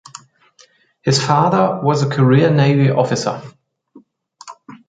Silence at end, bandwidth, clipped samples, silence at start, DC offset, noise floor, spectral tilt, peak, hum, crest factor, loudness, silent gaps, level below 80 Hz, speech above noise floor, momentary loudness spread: 0.15 s; 9.2 kHz; under 0.1%; 0.15 s; under 0.1%; -52 dBFS; -6 dB/octave; 0 dBFS; none; 16 dB; -15 LUFS; none; -58 dBFS; 38 dB; 12 LU